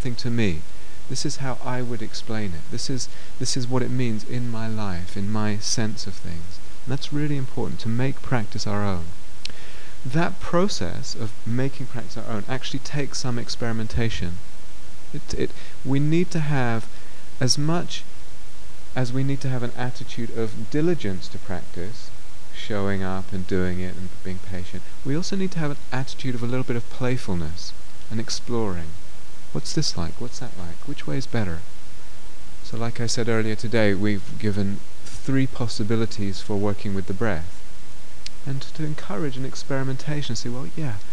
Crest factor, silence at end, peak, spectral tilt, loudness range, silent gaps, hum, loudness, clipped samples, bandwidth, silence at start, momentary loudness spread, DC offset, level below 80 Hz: 20 dB; 0 s; -4 dBFS; -5 dB/octave; 5 LU; none; none; -28 LUFS; under 0.1%; 11 kHz; 0 s; 16 LU; 20%; -46 dBFS